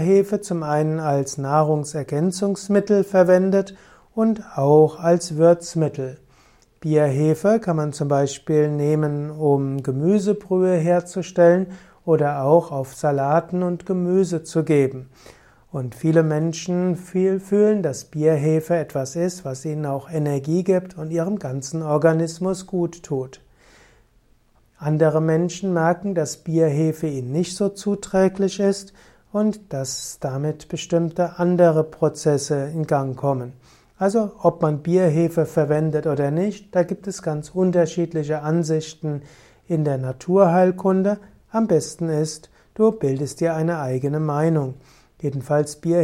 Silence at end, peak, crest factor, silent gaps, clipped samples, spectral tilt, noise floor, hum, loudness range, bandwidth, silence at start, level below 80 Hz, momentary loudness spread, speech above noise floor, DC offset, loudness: 0 s; -2 dBFS; 18 dB; none; under 0.1%; -7 dB/octave; -58 dBFS; none; 4 LU; 14 kHz; 0 s; -58 dBFS; 10 LU; 38 dB; under 0.1%; -21 LUFS